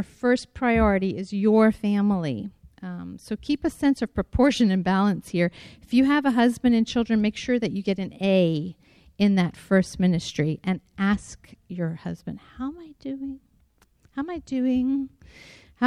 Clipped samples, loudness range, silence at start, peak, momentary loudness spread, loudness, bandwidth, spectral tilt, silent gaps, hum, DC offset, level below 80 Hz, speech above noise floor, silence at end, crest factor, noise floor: under 0.1%; 8 LU; 0 s; -6 dBFS; 16 LU; -24 LUFS; 12.5 kHz; -6.5 dB/octave; none; none; under 0.1%; -44 dBFS; 38 dB; 0 s; 18 dB; -62 dBFS